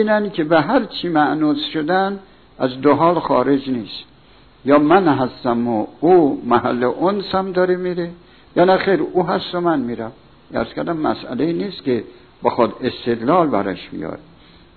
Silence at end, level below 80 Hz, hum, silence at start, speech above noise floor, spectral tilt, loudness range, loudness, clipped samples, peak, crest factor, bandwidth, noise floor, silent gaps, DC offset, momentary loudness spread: 0.6 s; -52 dBFS; none; 0 s; 31 dB; -9.5 dB/octave; 5 LU; -18 LUFS; under 0.1%; -2 dBFS; 16 dB; 4.6 kHz; -48 dBFS; none; 0.2%; 13 LU